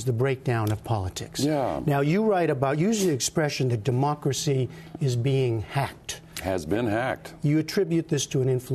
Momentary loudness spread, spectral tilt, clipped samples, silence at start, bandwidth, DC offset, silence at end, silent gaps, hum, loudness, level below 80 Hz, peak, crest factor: 7 LU; -5.5 dB/octave; under 0.1%; 0 s; 13.5 kHz; under 0.1%; 0 s; none; none; -26 LUFS; -54 dBFS; -10 dBFS; 16 dB